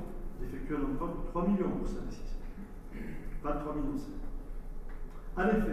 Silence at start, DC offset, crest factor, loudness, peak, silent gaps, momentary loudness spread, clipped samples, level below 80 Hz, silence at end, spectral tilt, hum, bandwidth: 0 s; under 0.1%; 16 dB; -37 LUFS; -18 dBFS; none; 17 LU; under 0.1%; -40 dBFS; 0 s; -8 dB/octave; none; 12.5 kHz